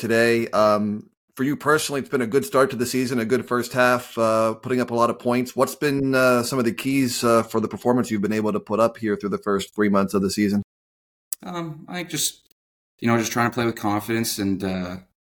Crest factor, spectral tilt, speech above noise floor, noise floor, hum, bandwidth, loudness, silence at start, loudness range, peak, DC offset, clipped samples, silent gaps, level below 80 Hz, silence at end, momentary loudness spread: 18 dB; -5 dB/octave; over 68 dB; under -90 dBFS; none; 19.5 kHz; -22 LUFS; 0 s; 4 LU; -4 dBFS; under 0.1%; under 0.1%; 1.17-1.28 s, 10.64-11.31 s, 12.52-12.98 s; -58 dBFS; 0.2 s; 9 LU